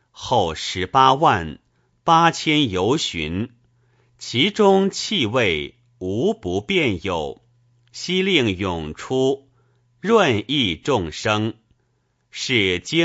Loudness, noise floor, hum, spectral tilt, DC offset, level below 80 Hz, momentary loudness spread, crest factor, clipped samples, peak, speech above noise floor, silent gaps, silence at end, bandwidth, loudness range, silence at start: -20 LUFS; -67 dBFS; none; -4.5 dB/octave; under 0.1%; -48 dBFS; 13 LU; 20 dB; under 0.1%; -2 dBFS; 48 dB; none; 0 s; 8 kHz; 4 LU; 0.15 s